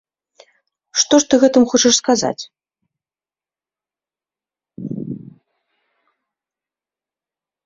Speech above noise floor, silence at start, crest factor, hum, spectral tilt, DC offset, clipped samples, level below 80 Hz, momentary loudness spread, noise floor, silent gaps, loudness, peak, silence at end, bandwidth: over 76 dB; 0.95 s; 20 dB; none; -2.5 dB/octave; under 0.1%; under 0.1%; -60 dBFS; 20 LU; under -90 dBFS; none; -14 LUFS; 0 dBFS; 2.45 s; 7.8 kHz